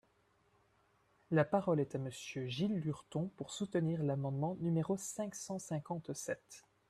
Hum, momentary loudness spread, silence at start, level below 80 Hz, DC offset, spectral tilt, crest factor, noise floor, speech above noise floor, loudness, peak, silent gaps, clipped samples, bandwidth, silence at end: none; 10 LU; 1.3 s; -74 dBFS; under 0.1%; -6 dB/octave; 20 dB; -74 dBFS; 36 dB; -38 LUFS; -18 dBFS; none; under 0.1%; 13.5 kHz; 0.3 s